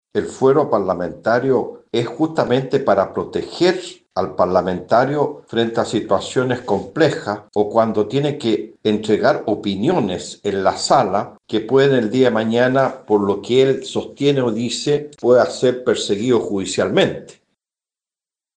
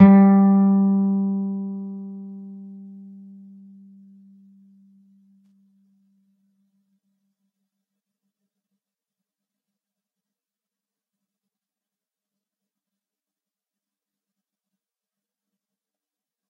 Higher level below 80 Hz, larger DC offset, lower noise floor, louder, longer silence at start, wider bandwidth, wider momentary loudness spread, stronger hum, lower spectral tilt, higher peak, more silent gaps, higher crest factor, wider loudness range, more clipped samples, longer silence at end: first, -58 dBFS vs -66 dBFS; neither; about the same, under -90 dBFS vs under -90 dBFS; about the same, -18 LUFS vs -18 LUFS; first, 0.15 s vs 0 s; first, 9.6 kHz vs 2.7 kHz; second, 8 LU vs 27 LU; neither; second, -5.5 dB/octave vs -13 dB/octave; about the same, -2 dBFS vs 0 dBFS; neither; second, 16 dB vs 24 dB; second, 2 LU vs 27 LU; neither; second, 1.25 s vs 13.7 s